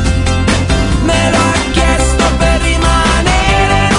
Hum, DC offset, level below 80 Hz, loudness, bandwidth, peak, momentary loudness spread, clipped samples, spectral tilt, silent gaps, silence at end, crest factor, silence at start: none; under 0.1%; -16 dBFS; -11 LUFS; 11 kHz; 0 dBFS; 2 LU; under 0.1%; -4.5 dB/octave; none; 0 s; 10 dB; 0 s